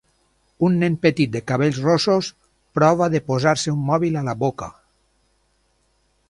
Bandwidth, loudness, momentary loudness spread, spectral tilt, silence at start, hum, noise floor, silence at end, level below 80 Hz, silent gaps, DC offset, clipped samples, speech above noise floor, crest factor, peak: 11.5 kHz; -20 LUFS; 7 LU; -6 dB/octave; 0.6 s; none; -65 dBFS; 1.6 s; -54 dBFS; none; under 0.1%; under 0.1%; 46 dB; 20 dB; -2 dBFS